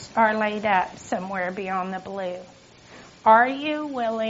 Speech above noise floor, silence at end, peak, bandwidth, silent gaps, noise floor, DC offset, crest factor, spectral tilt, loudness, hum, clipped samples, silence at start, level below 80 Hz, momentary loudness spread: 24 dB; 0 s; -4 dBFS; 8 kHz; none; -47 dBFS; under 0.1%; 20 dB; -3 dB/octave; -23 LUFS; none; under 0.1%; 0 s; -62 dBFS; 14 LU